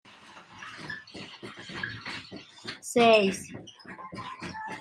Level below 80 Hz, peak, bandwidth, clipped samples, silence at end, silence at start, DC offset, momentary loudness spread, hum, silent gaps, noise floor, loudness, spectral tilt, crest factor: -68 dBFS; -8 dBFS; 14 kHz; under 0.1%; 0 s; 0.05 s; under 0.1%; 24 LU; none; none; -51 dBFS; -28 LUFS; -4 dB/octave; 22 dB